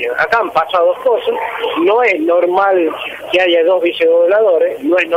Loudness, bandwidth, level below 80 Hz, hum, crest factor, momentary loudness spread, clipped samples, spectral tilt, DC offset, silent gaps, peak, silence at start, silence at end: -13 LUFS; 15 kHz; -56 dBFS; none; 10 dB; 6 LU; under 0.1%; -4.5 dB/octave; under 0.1%; none; -2 dBFS; 0 s; 0 s